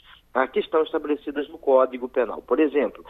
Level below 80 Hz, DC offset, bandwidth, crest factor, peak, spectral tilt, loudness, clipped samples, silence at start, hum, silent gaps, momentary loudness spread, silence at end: -58 dBFS; under 0.1%; 4 kHz; 18 dB; -6 dBFS; -7 dB/octave; -24 LUFS; under 0.1%; 0.35 s; none; none; 8 LU; 0.1 s